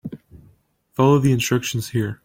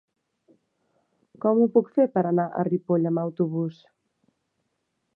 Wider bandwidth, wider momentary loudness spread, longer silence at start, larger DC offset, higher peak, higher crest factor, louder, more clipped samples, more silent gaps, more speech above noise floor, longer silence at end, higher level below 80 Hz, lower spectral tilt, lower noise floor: first, 17 kHz vs 4.4 kHz; first, 15 LU vs 7 LU; second, 0.05 s vs 1.45 s; neither; about the same, -4 dBFS vs -6 dBFS; about the same, 16 dB vs 20 dB; first, -19 LUFS vs -24 LUFS; neither; neither; second, 39 dB vs 54 dB; second, 0.1 s vs 1.45 s; first, -52 dBFS vs -78 dBFS; second, -6 dB/octave vs -12 dB/octave; second, -57 dBFS vs -77 dBFS